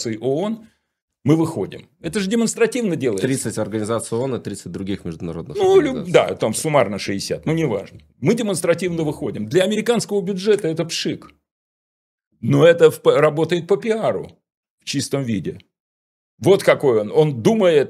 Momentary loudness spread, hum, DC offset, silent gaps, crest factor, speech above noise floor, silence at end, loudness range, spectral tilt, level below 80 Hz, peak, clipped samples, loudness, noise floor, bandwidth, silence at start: 13 LU; none; under 0.1%; 1.02-1.08 s, 11.51-12.18 s, 12.27-12.31 s, 14.57-14.63 s, 14.70-14.78 s, 15.80-16.38 s; 18 dB; over 71 dB; 0 s; 4 LU; -5.5 dB/octave; -56 dBFS; 0 dBFS; under 0.1%; -19 LUFS; under -90 dBFS; 15 kHz; 0 s